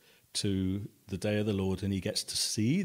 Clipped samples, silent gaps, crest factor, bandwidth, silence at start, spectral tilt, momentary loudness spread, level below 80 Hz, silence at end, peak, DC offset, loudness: under 0.1%; none; 14 dB; 16 kHz; 0.35 s; -4.5 dB/octave; 7 LU; -62 dBFS; 0 s; -18 dBFS; under 0.1%; -32 LUFS